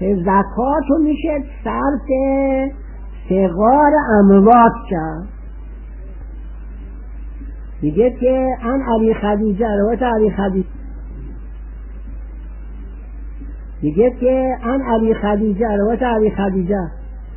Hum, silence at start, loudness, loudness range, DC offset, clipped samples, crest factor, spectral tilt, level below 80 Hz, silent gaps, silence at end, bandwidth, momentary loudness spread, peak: none; 0 s; -16 LUFS; 10 LU; under 0.1%; under 0.1%; 16 dB; -12.5 dB/octave; -30 dBFS; none; 0 s; 3.2 kHz; 22 LU; 0 dBFS